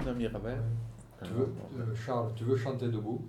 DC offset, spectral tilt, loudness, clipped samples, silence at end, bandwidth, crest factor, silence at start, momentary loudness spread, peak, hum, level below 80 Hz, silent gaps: under 0.1%; -8 dB/octave; -35 LUFS; under 0.1%; 0 s; 10.5 kHz; 16 dB; 0 s; 7 LU; -18 dBFS; none; -52 dBFS; none